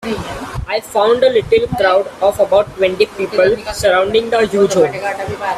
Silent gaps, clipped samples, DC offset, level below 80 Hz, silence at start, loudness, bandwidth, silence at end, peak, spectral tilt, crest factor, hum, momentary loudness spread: none; under 0.1%; under 0.1%; -38 dBFS; 0 s; -14 LUFS; 14.5 kHz; 0 s; 0 dBFS; -4.5 dB/octave; 14 dB; none; 9 LU